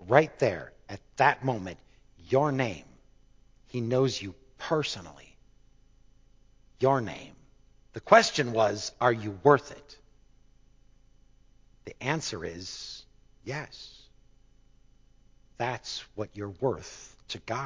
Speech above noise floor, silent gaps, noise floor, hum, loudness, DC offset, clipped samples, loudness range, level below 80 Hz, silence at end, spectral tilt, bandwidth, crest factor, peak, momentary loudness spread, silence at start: 32 dB; none; -60 dBFS; none; -28 LUFS; under 0.1%; under 0.1%; 13 LU; -60 dBFS; 0 s; -5 dB/octave; 7.6 kHz; 28 dB; -4 dBFS; 23 LU; 0 s